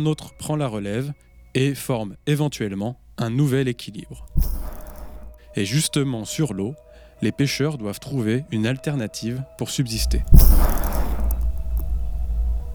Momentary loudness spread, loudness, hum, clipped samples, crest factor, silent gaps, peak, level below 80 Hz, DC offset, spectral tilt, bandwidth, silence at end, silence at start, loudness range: 12 LU; -24 LUFS; none; under 0.1%; 20 dB; none; 0 dBFS; -24 dBFS; under 0.1%; -5.5 dB/octave; over 20 kHz; 0 s; 0 s; 4 LU